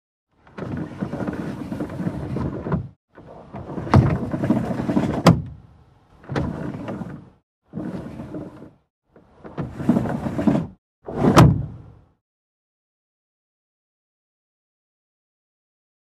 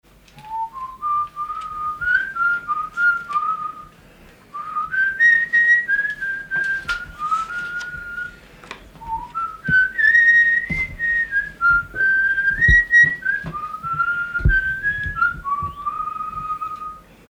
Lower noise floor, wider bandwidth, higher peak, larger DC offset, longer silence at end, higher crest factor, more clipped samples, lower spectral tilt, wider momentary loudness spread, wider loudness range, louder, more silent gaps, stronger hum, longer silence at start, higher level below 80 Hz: first, -52 dBFS vs -47 dBFS; about the same, 15 kHz vs 15.5 kHz; about the same, 0 dBFS vs -2 dBFS; neither; first, 4.1 s vs 0.3 s; first, 24 dB vs 18 dB; neither; first, -7.5 dB/octave vs -4.5 dB/octave; first, 20 LU vs 17 LU; first, 12 LU vs 7 LU; second, -22 LUFS vs -18 LUFS; first, 2.96-3.08 s, 7.43-7.62 s, 8.90-9.02 s, 10.78-11.02 s vs none; neither; first, 0.55 s vs 0.35 s; about the same, -40 dBFS vs -36 dBFS